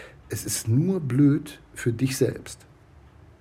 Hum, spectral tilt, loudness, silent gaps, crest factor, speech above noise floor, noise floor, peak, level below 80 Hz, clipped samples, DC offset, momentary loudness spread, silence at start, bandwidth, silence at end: none; -6 dB/octave; -25 LUFS; none; 16 dB; 28 dB; -52 dBFS; -10 dBFS; -54 dBFS; under 0.1%; under 0.1%; 18 LU; 0 s; 16 kHz; 0.85 s